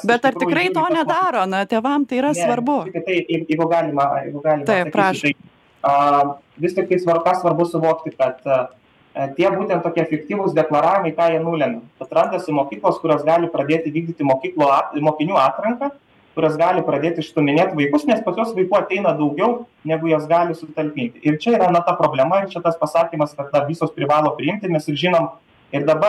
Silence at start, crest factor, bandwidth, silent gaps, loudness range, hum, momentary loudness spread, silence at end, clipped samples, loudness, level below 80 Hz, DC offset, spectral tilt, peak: 0 s; 18 dB; 12.5 kHz; none; 1 LU; none; 6 LU; 0 s; under 0.1%; -19 LUFS; -64 dBFS; under 0.1%; -6.5 dB/octave; -2 dBFS